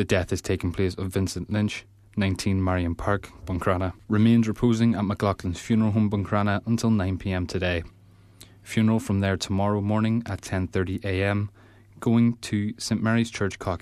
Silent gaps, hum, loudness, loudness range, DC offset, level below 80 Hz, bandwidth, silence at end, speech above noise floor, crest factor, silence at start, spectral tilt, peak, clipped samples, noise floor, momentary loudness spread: none; none; -25 LUFS; 3 LU; under 0.1%; -46 dBFS; 14 kHz; 0.05 s; 27 dB; 16 dB; 0 s; -6.5 dB/octave; -8 dBFS; under 0.1%; -51 dBFS; 7 LU